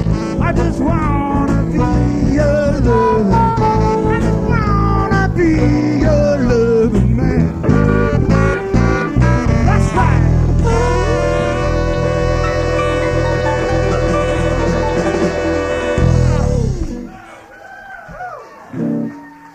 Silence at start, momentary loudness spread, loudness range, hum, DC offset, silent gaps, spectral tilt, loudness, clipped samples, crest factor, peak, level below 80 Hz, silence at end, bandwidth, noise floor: 0 s; 7 LU; 4 LU; none; under 0.1%; none; -7.5 dB/octave; -14 LUFS; under 0.1%; 14 dB; 0 dBFS; -22 dBFS; 0.05 s; 9.6 kHz; -36 dBFS